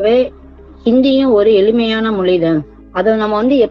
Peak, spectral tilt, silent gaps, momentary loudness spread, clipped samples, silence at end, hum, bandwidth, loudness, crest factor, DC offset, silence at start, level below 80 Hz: -2 dBFS; -8 dB/octave; none; 9 LU; under 0.1%; 0 s; none; 6 kHz; -13 LUFS; 12 dB; under 0.1%; 0 s; -40 dBFS